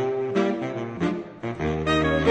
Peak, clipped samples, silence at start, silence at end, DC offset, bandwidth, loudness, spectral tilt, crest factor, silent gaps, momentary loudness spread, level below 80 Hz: -8 dBFS; under 0.1%; 0 s; 0 s; under 0.1%; 9.2 kHz; -25 LUFS; -6.5 dB/octave; 18 dB; none; 9 LU; -42 dBFS